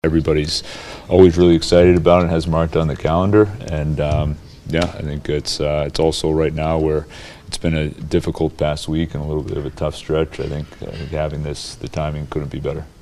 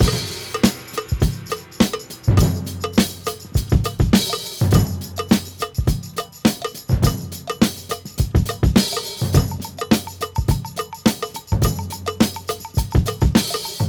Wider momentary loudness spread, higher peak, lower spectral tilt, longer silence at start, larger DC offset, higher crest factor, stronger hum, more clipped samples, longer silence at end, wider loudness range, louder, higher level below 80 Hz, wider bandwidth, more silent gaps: first, 14 LU vs 11 LU; about the same, 0 dBFS vs 0 dBFS; about the same, -6.5 dB/octave vs -5.5 dB/octave; about the same, 0.05 s vs 0 s; neither; about the same, 18 dB vs 18 dB; neither; neither; first, 0.15 s vs 0 s; first, 9 LU vs 2 LU; first, -18 LUFS vs -21 LUFS; about the same, -32 dBFS vs -28 dBFS; second, 12.5 kHz vs over 20 kHz; neither